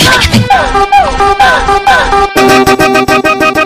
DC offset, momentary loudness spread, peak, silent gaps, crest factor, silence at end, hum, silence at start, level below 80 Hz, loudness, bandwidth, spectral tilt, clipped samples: under 0.1%; 2 LU; 0 dBFS; none; 6 dB; 0 s; none; 0 s; -22 dBFS; -6 LUFS; 16 kHz; -4 dB/octave; 1%